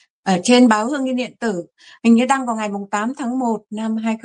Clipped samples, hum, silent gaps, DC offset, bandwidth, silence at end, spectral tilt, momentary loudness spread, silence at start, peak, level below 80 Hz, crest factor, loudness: under 0.1%; none; none; under 0.1%; 10.5 kHz; 0.05 s; -4.5 dB/octave; 11 LU; 0.25 s; -2 dBFS; -66 dBFS; 16 dB; -18 LUFS